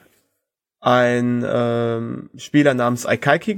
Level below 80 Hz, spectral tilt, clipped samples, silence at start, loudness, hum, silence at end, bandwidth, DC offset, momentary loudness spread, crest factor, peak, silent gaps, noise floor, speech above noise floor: -60 dBFS; -6 dB/octave; under 0.1%; 0.8 s; -18 LUFS; none; 0 s; 17 kHz; under 0.1%; 9 LU; 18 dB; 0 dBFS; none; -77 dBFS; 59 dB